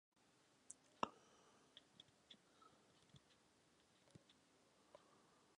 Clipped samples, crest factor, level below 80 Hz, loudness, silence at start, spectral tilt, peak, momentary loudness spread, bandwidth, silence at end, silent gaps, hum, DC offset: under 0.1%; 38 dB; under -90 dBFS; -54 LUFS; 0.15 s; -3 dB/octave; -22 dBFS; 19 LU; 11 kHz; 0 s; none; none; under 0.1%